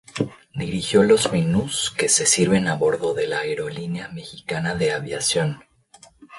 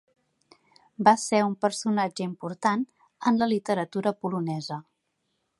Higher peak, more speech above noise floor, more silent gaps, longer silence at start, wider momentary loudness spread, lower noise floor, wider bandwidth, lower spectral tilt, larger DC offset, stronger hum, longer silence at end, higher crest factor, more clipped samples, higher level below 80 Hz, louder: about the same, -4 dBFS vs -4 dBFS; second, 30 dB vs 51 dB; neither; second, 0.15 s vs 1 s; about the same, 13 LU vs 12 LU; second, -52 dBFS vs -77 dBFS; about the same, 11.5 kHz vs 11.5 kHz; second, -3.5 dB/octave vs -5 dB/octave; neither; neither; second, 0 s vs 0.8 s; second, 18 dB vs 24 dB; neither; first, -52 dBFS vs -74 dBFS; first, -21 LUFS vs -26 LUFS